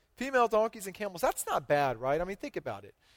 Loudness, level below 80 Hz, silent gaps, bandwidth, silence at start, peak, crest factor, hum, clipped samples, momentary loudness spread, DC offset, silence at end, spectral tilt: -31 LUFS; -58 dBFS; none; 18 kHz; 0.2 s; -16 dBFS; 16 dB; none; under 0.1%; 11 LU; under 0.1%; 0.3 s; -4 dB/octave